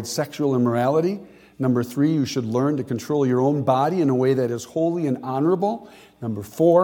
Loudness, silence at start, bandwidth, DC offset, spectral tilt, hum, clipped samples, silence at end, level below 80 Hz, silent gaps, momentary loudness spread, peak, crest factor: -22 LUFS; 0 s; 17.5 kHz; under 0.1%; -7 dB/octave; none; under 0.1%; 0 s; -64 dBFS; none; 7 LU; -4 dBFS; 16 dB